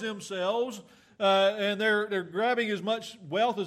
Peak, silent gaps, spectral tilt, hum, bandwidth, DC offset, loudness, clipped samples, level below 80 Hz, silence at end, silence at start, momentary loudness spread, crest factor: -14 dBFS; none; -4 dB/octave; none; 14 kHz; under 0.1%; -28 LUFS; under 0.1%; -80 dBFS; 0 s; 0 s; 10 LU; 16 dB